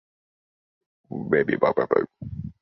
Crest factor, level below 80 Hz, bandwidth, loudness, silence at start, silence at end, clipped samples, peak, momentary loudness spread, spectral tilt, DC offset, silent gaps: 22 dB; -54 dBFS; 5.8 kHz; -23 LUFS; 1.1 s; 0.1 s; under 0.1%; -4 dBFS; 15 LU; -10 dB/octave; under 0.1%; none